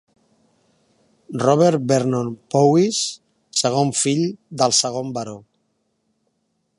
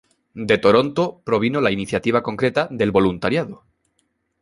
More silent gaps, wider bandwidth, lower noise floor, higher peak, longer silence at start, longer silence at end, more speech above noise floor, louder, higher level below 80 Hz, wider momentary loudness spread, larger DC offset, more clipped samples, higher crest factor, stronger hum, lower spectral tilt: neither; about the same, 11.5 kHz vs 11.5 kHz; about the same, -70 dBFS vs -69 dBFS; about the same, -2 dBFS vs -2 dBFS; first, 1.3 s vs 0.35 s; first, 1.4 s vs 0.85 s; about the same, 52 dB vs 50 dB; about the same, -19 LUFS vs -19 LUFS; second, -66 dBFS vs -50 dBFS; first, 14 LU vs 7 LU; neither; neither; about the same, 20 dB vs 18 dB; neither; second, -4.5 dB/octave vs -6.5 dB/octave